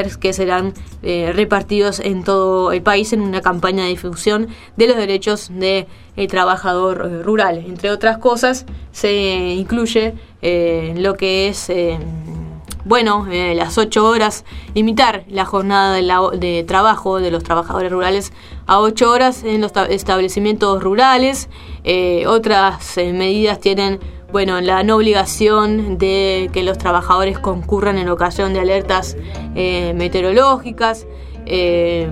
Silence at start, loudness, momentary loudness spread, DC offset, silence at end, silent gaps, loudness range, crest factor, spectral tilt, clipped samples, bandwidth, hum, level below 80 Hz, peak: 0 s; -15 LUFS; 9 LU; under 0.1%; 0 s; none; 3 LU; 16 dB; -4.5 dB/octave; under 0.1%; 15 kHz; none; -34 dBFS; 0 dBFS